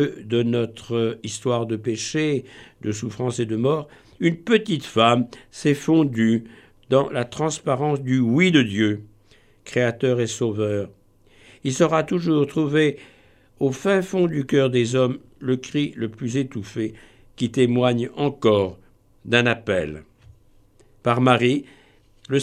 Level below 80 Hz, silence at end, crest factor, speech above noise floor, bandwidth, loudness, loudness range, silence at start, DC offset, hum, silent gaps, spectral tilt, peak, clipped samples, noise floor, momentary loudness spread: -58 dBFS; 0 s; 20 dB; 34 dB; 13.5 kHz; -22 LUFS; 4 LU; 0 s; under 0.1%; none; none; -6 dB/octave; -2 dBFS; under 0.1%; -55 dBFS; 10 LU